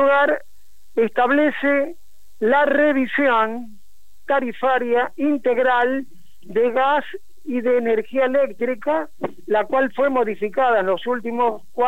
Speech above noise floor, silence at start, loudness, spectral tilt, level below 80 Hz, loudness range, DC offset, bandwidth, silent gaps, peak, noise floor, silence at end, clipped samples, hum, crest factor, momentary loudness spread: 40 dB; 0 s; -20 LUFS; -6 dB/octave; -64 dBFS; 2 LU; 2%; 16 kHz; none; -6 dBFS; -60 dBFS; 0 s; under 0.1%; none; 14 dB; 8 LU